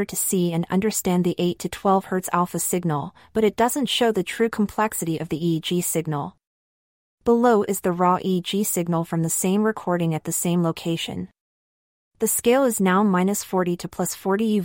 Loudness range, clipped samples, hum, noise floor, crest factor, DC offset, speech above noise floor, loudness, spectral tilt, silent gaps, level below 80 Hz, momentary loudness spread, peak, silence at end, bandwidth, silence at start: 2 LU; under 0.1%; none; under -90 dBFS; 16 dB; under 0.1%; over 68 dB; -22 LUFS; -5 dB/octave; 6.47-7.18 s, 11.40-12.11 s; -56 dBFS; 7 LU; -6 dBFS; 0 s; 16.5 kHz; 0 s